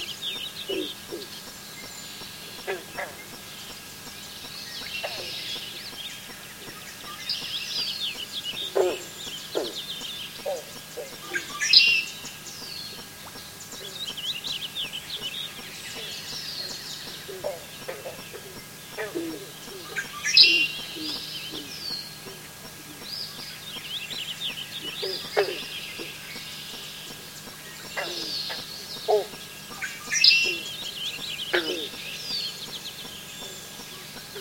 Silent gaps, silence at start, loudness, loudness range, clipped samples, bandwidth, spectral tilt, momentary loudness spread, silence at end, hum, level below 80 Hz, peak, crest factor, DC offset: none; 0 s; -27 LUFS; 12 LU; under 0.1%; 17 kHz; -1 dB/octave; 13 LU; 0 s; none; -62 dBFS; -2 dBFS; 28 dB; under 0.1%